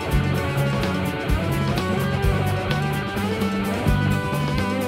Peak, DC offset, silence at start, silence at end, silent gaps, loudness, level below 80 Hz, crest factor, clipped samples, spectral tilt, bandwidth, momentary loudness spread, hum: -6 dBFS; under 0.1%; 0 s; 0 s; none; -23 LUFS; -32 dBFS; 16 dB; under 0.1%; -6.5 dB/octave; 16 kHz; 2 LU; none